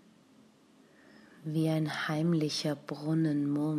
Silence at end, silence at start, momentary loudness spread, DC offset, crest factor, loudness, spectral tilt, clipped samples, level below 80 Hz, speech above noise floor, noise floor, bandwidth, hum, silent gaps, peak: 0 s; 1.4 s; 7 LU; under 0.1%; 14 dB; -31 LUFS; -6 dB/octave; under 0.1%; -76 dBFS; 31 dB; -62 dBFS; 14.5 kHz; none; none; -20 dBFS